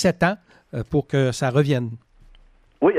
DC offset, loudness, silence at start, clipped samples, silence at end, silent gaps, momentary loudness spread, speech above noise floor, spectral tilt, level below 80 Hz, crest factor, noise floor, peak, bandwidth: under 0.1%; -22 LUFS; 0 s; under 0.1%; 0 s; none; 14 LU; 31 dB; -6.5 dB/octave; -48 dBFS; 16 dB; -52 dBFS; -6 dBFS; 13 kHz